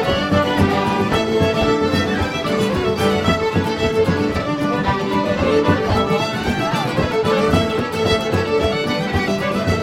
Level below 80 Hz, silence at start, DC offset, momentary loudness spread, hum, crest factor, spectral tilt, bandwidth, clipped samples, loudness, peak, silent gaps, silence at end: -36 dBFS; 0 s; under 0.1%; 3 LU; none; 16 dB; -6 dB/octave; 16.5 kHz; under 0.1%; -18 LUFS; -2 dBFS; none; 0 s